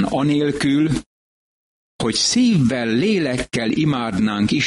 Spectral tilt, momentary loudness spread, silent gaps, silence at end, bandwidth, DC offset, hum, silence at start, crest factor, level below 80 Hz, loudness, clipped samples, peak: -5 dB/octave; 6 LU; 1.06-1.99 s; 0 s; 11.5 kHz; under 0.1%; none; 0 s; 12 dB; -46 dBFS; -18 LUFS; under 0.1%; -8 dBFS